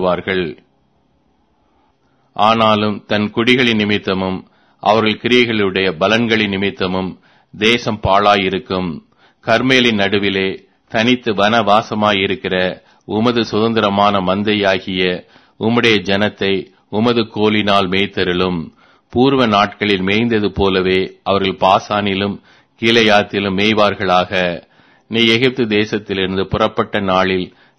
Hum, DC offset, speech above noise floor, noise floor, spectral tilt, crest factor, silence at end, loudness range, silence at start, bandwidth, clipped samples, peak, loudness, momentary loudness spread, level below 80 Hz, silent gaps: none; under 0.1%; 44 dB; -59 dBFS; -5.5 dB/octave; 16 dB; 0.3 s; 2 LU; 0 s; 11 kHz; under 0.1%; 0 dBFS; -15 LUFS; 9 LU; -46 dBFS; none